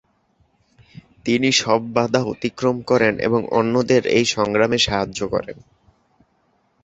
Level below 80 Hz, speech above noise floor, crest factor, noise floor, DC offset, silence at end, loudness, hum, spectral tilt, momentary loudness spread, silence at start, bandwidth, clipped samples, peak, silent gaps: -50 dBFS; 45 dB; 18 dB; -64 dBFS; under 0.1%; 1.3 s; -19 LUFS; none; -4 dB/octave; 8 LU; 1.25 s; 8.2 kHz; under 0.1%; -2 dBFS; none